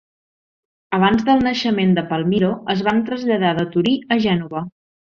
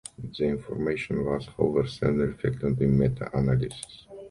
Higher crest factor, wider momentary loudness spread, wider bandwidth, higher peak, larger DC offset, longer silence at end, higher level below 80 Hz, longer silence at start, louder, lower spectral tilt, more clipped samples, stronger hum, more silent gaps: about the same, 16 dB vs 18 dB; second, 6 LU vs 11 LU; second, 7 kHz vs 11.5 kHz; first, -2 dBFS vs -8 dBFS; neither; first, 0.45 s vs 0 s; second, -52 dBFS vs -44 dBFS; first, 0.9 s vs 0.2 s; first, -18 LUFS vs -27 LUFS; about the same, -7 dB/octave vs -7.5 dB/octave; neither; neither; neither